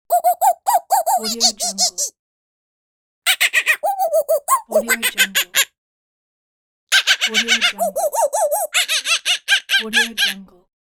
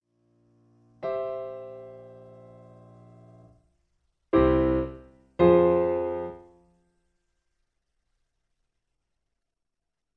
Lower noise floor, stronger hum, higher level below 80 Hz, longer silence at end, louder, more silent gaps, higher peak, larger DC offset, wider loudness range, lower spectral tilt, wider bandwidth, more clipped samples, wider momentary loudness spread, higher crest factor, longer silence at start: first, under -90 dBFS vs -85 dBFS; neither; second, -64 dBFS vs -46 dBFS; second, 0.35 s vs 3.8 s; first, -16 LUFS vs -25 LUFS; first, 2.19-3.22 s, 5.78-6.87 s vs none; first, -2 dBFS vs -8 dBFS; neither; second, 2 LU vs 14 LU; second, 1 dB/octave vs -10.5 dB/octave; first, over 20 kHz vs 4.6 kHz; neither; second, 5 LU vs 23 LU; about the same, 18 dB vs 22 dB; second, 0.1 s vs 1.05 s